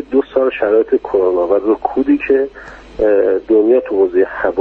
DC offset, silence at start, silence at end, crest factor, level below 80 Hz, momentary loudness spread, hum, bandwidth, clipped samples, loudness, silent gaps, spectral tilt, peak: under 0.1%; 0 s; 0 s; 12 dB; -44 dBFS; 4 LU; none; 4.5 kHz; under 0.1%; -14 LUFS; none; -8 dB/octave; 0 dBFS